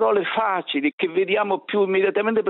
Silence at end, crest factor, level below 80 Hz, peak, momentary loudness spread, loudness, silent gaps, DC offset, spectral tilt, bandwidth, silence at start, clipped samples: 0 s; 12 dB; -68 dBFS; -10 dBFS; 3 LU; -21 LUFS; 0.93-0.98 s; under 0.1%; -8.5 dB/octave; 4.1 kHz; 0 s; under 0.1%